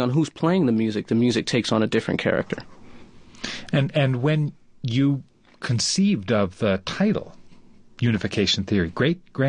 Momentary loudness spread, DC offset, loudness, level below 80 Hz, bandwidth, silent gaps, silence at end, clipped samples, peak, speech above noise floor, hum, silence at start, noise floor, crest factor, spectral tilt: 9 LU; under 0.1%; -23 LUFS; -50 dBFS; 10.5 kHz; none; 0 s; under 0.1%; -6 dBFS; 26 dB; none; 0 s; -47 dBFS; 16 dB; -5.5 dB/octave